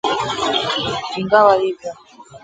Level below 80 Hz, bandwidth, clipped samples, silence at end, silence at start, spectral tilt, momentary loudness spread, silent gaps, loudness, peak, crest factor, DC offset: -54 dBFS; 9.2 kHz; under 0.1%; 0.05 s; 0.05 s; -4 dB/octave; 12 LU; none; -17 LUFS; 0 dBFS; 18 dB; under 0.1%